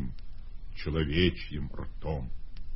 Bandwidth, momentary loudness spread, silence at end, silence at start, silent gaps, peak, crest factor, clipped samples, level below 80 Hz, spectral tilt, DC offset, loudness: 5.8 kHz; 22 LU; 0 s; 0 s; none; -12 dBFS; 20 dB; under 0.1%; -40 dBFS; -10 dB/octave; under 0.1%; -32 LUFS